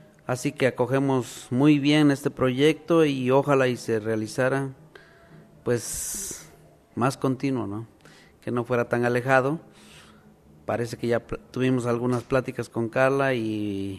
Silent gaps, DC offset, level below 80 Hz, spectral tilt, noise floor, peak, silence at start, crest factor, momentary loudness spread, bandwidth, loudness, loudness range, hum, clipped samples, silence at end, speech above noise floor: none; under 0.1%; -56 dBFS; -5.5 dB/octave; -53 dBFS; -4 dBFS; 0.3 s; 20 dB; 12 LU; 14 kHz; -25 LUFS; 8 LU; none; under 0.1%; 0 s; 29 dB